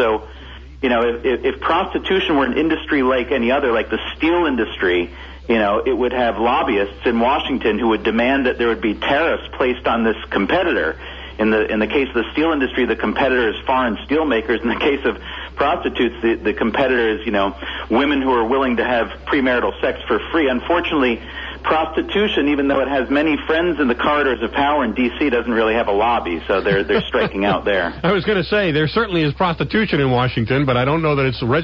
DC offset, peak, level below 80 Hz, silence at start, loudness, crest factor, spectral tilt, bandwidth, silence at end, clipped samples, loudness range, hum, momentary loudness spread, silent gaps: under 0.1%; -6 dBFS; -38 dBFS; 0 s; -18 LUFS; 12 dB; -7.5 dB/octave; 7 kHz; 0 s; under 0.1%; 1 LU; none; 4 LU; none